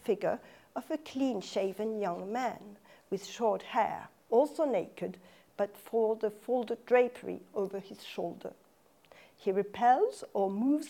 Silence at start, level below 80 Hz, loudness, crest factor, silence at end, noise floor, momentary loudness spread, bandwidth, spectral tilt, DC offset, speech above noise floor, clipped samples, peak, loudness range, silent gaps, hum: 0.05 s; -80 dBFS; -33 LUFS; 18 dB; 0 s; -65 dBFS; 15 LU; 17 kHz; -5.5 dB/octave; under 0.1%; 33 dB; under 0.1%; -14 dBFS; 3 LU; none; none